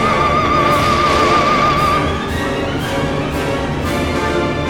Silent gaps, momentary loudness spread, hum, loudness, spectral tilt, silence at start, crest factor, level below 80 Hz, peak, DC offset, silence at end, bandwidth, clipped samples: none; 7 LU; none; -15 LUFS; -5 dB/octave; 0 s; 14 dB; -30 dBFS; -2 dBFS; under 0.1%; 0 s; 19 kHz; under 0.1%